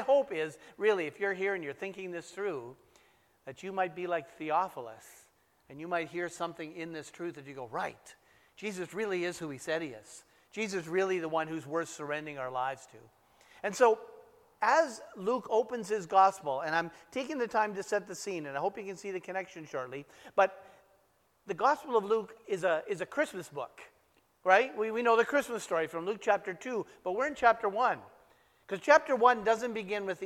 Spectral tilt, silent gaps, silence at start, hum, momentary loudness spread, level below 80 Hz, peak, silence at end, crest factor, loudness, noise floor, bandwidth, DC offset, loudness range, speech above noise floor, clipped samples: -4 dB/octave; none; 0 s; none; 16 LU; -76 dBFS; -8 dBFS; 0 s; 24 dB; -32 LUFS; -71 dBFS; 15.5 kHz; under 0.1%; 8 LU; 38 dB; under 0.1%